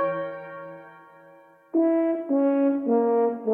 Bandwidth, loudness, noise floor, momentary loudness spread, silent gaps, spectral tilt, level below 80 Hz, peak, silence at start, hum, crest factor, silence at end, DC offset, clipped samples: 3.3 kHz; -24 LUFS; -52 dBFS; 18 LU; none; -10 dB/octave; -76 dBFS; -12 dBFS; 0 s; none; 12 dB; 0 s; under 0.1%; under 0.1%